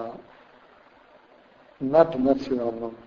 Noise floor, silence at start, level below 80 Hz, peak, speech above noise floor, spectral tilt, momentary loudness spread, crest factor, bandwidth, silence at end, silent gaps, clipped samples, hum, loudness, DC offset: -55 dBFS; 0 s; -58 dBFS; -4 dBFS; 31 dB; -8 dB/octave; 17 LU; 22 dB; 7 kHz; 0.1 s; none; under 0.1%; none; -23 LUFS; under 0.1%